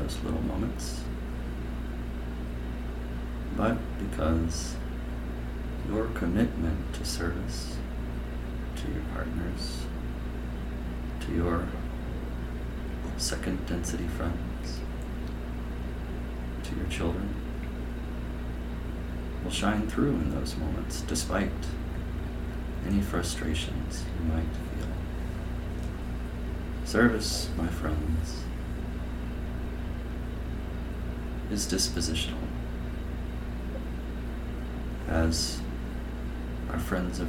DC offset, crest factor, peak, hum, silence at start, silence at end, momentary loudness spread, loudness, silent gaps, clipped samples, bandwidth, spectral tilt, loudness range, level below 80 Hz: under 0.1%; 22 dB; -10 dBFS; 60 Hz at -45 dBFS; 0 s; 0 s; 9 LU; -33 LUFS; none; under 0.1%; 16 kHz; -5 dB/octave; 5 LU; -34 dBFS